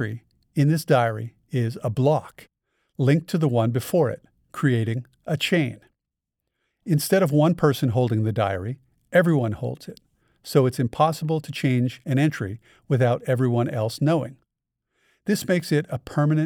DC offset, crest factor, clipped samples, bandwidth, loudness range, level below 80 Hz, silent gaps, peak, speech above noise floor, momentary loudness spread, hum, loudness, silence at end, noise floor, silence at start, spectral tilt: under 0.1%; 18 dB; under 0.1%; 18 kHz; 3 LU; -60 dBFS; none; -6 dBFS; 62 dB; 13 LU; none; -23 LUFS; 0 s; -84 dBFS; 0 s; -7 dB/octave